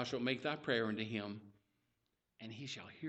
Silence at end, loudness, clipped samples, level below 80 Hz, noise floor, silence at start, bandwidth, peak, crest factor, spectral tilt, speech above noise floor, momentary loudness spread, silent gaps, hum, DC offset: 0 s; -40 LUFS; under 0.1%; -80 dBFS; -85 dBFS; 0 s; 8.4 kHz; -20 dBFS; 22 dB; -5 dB/octave; 44 dB; 16 LU; none; none; under 0.1%